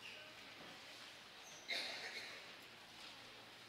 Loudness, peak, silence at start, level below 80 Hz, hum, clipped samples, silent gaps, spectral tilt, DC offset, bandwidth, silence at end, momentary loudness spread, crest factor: -50 LUFS; -30 dBFS; 0 s; -86 dBFS; none; under 0.1%; none; -1 dB/octave; under 0.1%; 16 kHz; 0 s; 12 LU; 22 dB